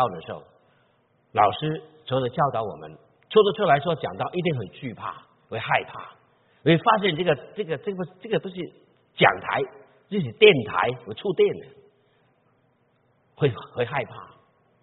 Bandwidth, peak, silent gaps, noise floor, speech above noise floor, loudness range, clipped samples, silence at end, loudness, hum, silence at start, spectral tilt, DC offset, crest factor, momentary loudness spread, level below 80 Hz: 4.1 kHz; -2 dBFS; none; -65 dBFS; 42 dB; 6 LU; under 0.1%; 0.55 s; -24 LUFS; none; 0 s; -3.5 dB/octave; under 0.1%; 24 dB; 18 LU; -64 dBFS